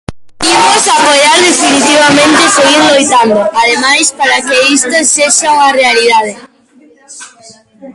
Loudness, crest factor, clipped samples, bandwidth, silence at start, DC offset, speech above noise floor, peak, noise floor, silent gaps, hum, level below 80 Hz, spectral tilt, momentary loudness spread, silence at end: -6 LUFS; 8 dB; 0.1%; 16 kHz; 0.1 s; under 0.1%; 35 dB; 0 dBFS; -43 dBFS; none; none; -46 dBFS; -1 dB/octave; 4 LU; 0.05 s